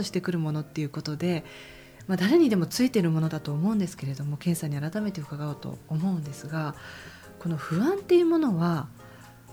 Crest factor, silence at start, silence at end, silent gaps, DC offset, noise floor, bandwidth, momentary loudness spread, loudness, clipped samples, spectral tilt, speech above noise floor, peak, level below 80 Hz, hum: 16 dB; 0 s; 0 s; none; under 0.1%; -48 dBFS; over 20 kHz; 20 LU; -27 LUFS; under 0.1%; -6.5 dB/octave; 22 dB; -12 dBFS; -62 dBFS; none